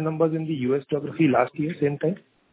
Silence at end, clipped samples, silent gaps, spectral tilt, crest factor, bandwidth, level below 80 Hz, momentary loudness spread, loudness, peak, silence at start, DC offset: 0.35 s; under 0.1%; none; -11.5 dB/octave; 20 dB; 4 kHz; -64 dBFS; 8 LU; -24 LUFS; -4 dBFS; 0 s; under 0.1%